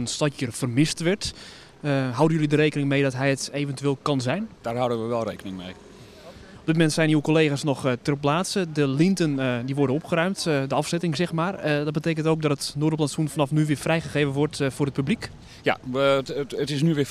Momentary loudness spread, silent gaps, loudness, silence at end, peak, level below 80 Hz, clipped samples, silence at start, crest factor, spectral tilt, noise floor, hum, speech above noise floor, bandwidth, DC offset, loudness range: 8 LU; none; -24 LUFS; 0 s; -6 dBFS; -56 dBFS; under 0.1%; 0 s; 18 dB; -5.5 dB/octave; -45 dBFS; none; 21 dB; 14 kHz; under 0.1%; 3 LU